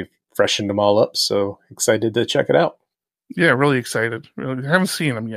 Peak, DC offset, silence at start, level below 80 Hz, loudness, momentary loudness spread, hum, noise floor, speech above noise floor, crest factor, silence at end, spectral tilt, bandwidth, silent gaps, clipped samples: -2 dBFS; under 0.1%; 0 s; -64 dBFS; -19 LUFS; 10 LU; none; -77 dBFS; 59 dB; 18 dB; 0 s; -4 dB/octave; 15.5 kHz; none; under 0.1%